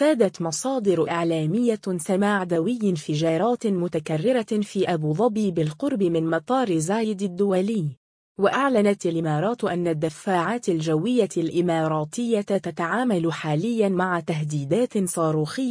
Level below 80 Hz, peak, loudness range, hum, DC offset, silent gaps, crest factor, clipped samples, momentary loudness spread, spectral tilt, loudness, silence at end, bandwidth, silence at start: -66 dBFS; -6 dBFS; 1 LU; none; under 0.1%; 7.97-8.35 s; 16 dB; under 0.1%; 4 LU; -6 dB/octave; -23 LUFS; 0 s; 10.5 kHz; 0 s